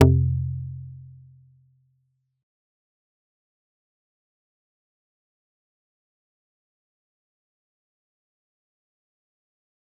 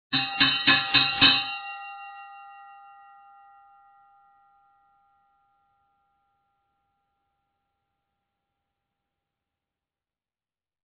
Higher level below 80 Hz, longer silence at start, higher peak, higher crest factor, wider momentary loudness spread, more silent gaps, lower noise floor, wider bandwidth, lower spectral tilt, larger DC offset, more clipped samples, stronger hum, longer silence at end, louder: first, -50 dBFS vs -62 dBFS; about the same, 0 s vs 0.1 s; about the same, -2 dBFS vs -2 dBFS; about the same, 30 dB vs 28 dB; about the same, 25 LU vs 25 LU; neither; second, -72 dBFS vs under -90 dBFS; about the same, 3.8 kHz vs 4 kHz; first, -9 dB/octave vs 0.5 dB/octave; neither; neither; neither; first, 8.95 s vs 8.4 s; second, -24 LUFS vs -19 LUFS